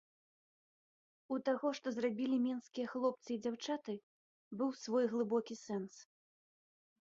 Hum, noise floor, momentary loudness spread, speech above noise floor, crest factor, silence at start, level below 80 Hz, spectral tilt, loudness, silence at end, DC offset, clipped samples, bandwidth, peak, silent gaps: none; under -90 dBFS; 8 LU; over 52 dB; 18 dB; 1.3 s; -86 dBFS; -4.5 dB/octave; -39 LUFS; 1.15 s; under 0.1%; under 0.1%; 7.6 kHz; -22 dBFS; 4.03-4.51 s